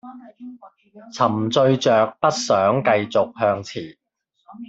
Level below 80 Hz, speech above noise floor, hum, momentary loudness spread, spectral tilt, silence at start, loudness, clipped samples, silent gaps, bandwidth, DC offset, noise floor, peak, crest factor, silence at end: -64 dBFS; 37 dB; none; 22 LU; -5 dB/octave; 0.05 s; -19 LUFS; under 0.1%; none; 8.2 kHz; under 0.1%; -56 dBFS; -4 dBFS; 18 dB; 0.05 s